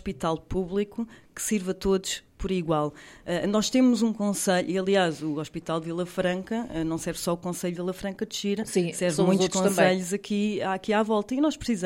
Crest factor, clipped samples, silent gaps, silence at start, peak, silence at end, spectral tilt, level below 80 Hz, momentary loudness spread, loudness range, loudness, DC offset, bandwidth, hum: 20 dB; under 0.1%; none; 0.05 s; -6 dBFS; 0 s; -5 dB/octave; -50 dBFS; 9 LU; 4 LU; -27 LUFS; under 0.1%; 16.5 kHz; none